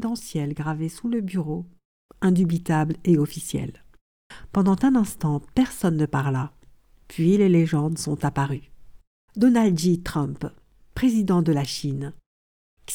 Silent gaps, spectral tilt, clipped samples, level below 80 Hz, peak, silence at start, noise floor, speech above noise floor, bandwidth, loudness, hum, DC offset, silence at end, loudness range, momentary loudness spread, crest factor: 1.85-2.09 s, 4.01-4.30 s, 9.07-9.28 s, 12.26-12.77 s; -6.5 dB/octave; under 0.1%; -48 dBFS; -8 dBFS; 0 s; -53 dBFS; 31 dB; 19 kHz; -23 LUFS; none; under 0.1%; 0 s; 3 LU; 14 LU; 16 dB